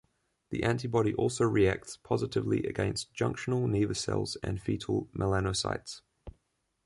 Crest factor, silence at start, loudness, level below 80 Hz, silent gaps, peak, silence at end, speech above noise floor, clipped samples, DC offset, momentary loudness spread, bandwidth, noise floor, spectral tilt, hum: 18 dB; 0.5 s; -31 LUFS; -50 dBFS; none; -14 dBFS; 0.55 s; 47 dB; under 0.1%; under 0.1%; 7 LU; 11.5 kHz; -77 dBFS; -5.5 dB/octave; none